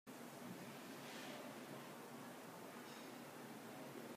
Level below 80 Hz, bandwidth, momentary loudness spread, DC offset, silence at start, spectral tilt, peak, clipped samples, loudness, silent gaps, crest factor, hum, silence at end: under -90 dBFS; 15.5 kHz; 3 LU; under 0.1%; 0.05 s; -4 dB/octave; -40 dBFS; under 0.1%; -54 LUFS; none; 14 dB; none; 0 s